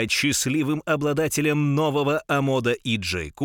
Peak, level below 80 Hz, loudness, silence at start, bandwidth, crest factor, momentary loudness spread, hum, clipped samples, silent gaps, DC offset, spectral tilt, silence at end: -8 dBFS; -50 dBFS; -23 LUFS; 0 s; 18 kHz; 14 dB; 4 LU; none; under 0.1%; none; under 0.1%; -4.5 dB/octave; 0 s